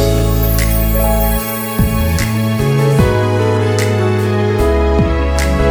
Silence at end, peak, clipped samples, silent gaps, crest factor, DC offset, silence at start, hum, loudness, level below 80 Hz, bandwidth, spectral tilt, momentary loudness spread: 0 s; 0 dBFS; under 0.1%; none; 12 dB; under 0.1%; 0 s; none; -14 LUFS; -18 dBFS; over 20 kHz; -6 dB/octave; 3 LU